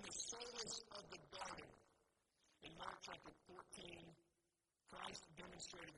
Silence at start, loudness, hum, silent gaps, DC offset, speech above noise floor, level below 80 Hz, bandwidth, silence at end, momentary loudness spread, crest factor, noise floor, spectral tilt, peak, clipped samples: 0 s; -54 LUFS; none; none; under 0.1%; 31 dB; -78 dBFS; 11.5 kHz; 0 s; 13 LU; 22 dB; -89 dBFS; -1.5 dB/octave; -34 dBFS; under 0.1%